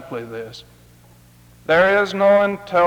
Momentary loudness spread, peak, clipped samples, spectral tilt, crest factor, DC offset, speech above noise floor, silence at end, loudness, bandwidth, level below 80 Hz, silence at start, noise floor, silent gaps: 19 LU; -4 dBFS; under 0.1%; -5.5 dB/octave; 16 dB; under 0.1%; 31 dB; 0 s; -16 LUFS; 16.5 kHz; -54 dBFS; 0 s; -49 dBFS; none